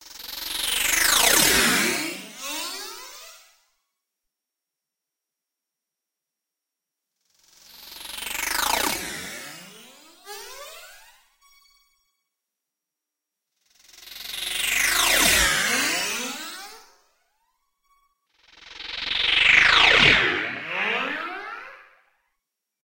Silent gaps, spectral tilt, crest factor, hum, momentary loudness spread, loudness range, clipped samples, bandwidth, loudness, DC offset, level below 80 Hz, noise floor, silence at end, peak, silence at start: none; -0.5 dB/octave; 24 dB; none; 24 LU; 19 LU; under 0.1%; 16.5 kHz; -19 LUFS; under 0.1%; -48 dBFS; -86 dBFS; 1.05 s; -2 dBFS; 0.05 s